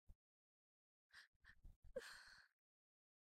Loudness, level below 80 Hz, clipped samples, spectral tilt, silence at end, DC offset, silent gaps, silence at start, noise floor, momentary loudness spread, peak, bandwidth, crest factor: -61 LUFS; -74 dBFS; under 0.1%; -2.5 dB/octave; 0.95 s; under 0.1%; 0.15-1.10 s, 1.27-1.40 s, 1.76-1.83 s; 0.1 s; under -90 dBFS; 13 LU; -40 dBFS; 14 kHz; 24 dB